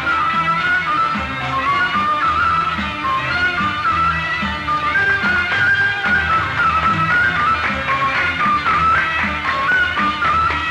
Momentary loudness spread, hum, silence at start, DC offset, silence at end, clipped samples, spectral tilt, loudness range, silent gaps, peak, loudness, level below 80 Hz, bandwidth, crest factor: 4 LU; none; 0 s; under 0.1%; 0 s; under 0.1%; -4.5 dB/octave; 2 LU; none; -6 dBFS; -16 LUFS; -40 dBFS; 12 kHz; 10 dB